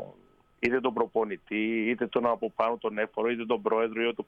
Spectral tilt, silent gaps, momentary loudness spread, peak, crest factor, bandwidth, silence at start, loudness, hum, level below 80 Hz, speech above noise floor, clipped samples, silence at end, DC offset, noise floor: -7 dB/octave; none; 4 LU; -12 dBFS; 18 dB; 7.4 kHz; 0 s; -29 LUFS; none; -68 dBFS; 32 dB; under 0.1%; 0.05 s; under 0.1%; -60 dBFS